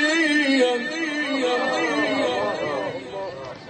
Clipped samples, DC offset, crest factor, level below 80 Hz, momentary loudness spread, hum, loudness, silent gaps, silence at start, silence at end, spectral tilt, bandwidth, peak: under 0.1%; under 0.1%; 14 dB; -64 dBFS; 13 LU; none; -22 LUFS; none; 0 s; 0 s; -3.5 dB/octave; 8.8 kHz; -8 dBFS